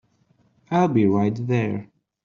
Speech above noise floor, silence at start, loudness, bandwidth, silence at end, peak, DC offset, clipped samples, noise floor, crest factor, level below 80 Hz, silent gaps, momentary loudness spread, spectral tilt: 42 dB; 0.7 s; -22 LUFS; 7.2 kHz; 0.4 s; -6 dBFS; under 0.1%; under 0.1%; -62 dBFS; 16 dB; -62 dBFS; none; 8 LU; -8 dB/octave